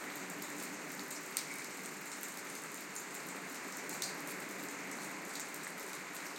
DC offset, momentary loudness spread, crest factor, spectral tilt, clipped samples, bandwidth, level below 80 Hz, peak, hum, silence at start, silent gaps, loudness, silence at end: under 0.1%; 4 LU; 30 dB; -1.5 dB/octave; under 0.1%; 17 kHz; under -90 dBFS; -14 dBFS; none; 0 s; none; -43 LUFS; 0 s